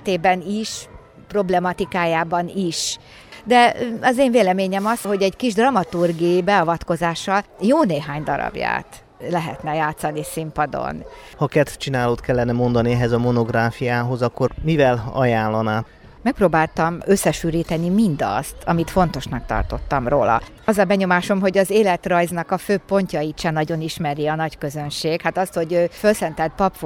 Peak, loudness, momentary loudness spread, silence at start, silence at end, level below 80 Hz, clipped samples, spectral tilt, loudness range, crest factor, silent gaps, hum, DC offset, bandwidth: -2 dBFS; -20 LUFS; 8 LU; 0 s; 0 s; -40 dBFS; under 0.1%; -5.5 dB/octave; 4 LU; 18 dB; none; none; under 0.1%; 18 kHz